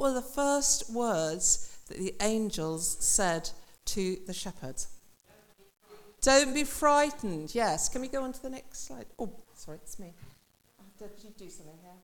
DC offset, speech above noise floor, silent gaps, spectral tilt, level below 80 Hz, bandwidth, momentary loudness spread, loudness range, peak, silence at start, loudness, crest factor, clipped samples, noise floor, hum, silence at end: under 0.1%; 33 dB; none; -2.5 dB/octave; -50 dBFS; 18 kHz; 23 LU; 14 LU; -12 dBFS; 0 s; -29 LUFS; 20 dB; under 0.1%; -64 dBFS; none; 0.05 s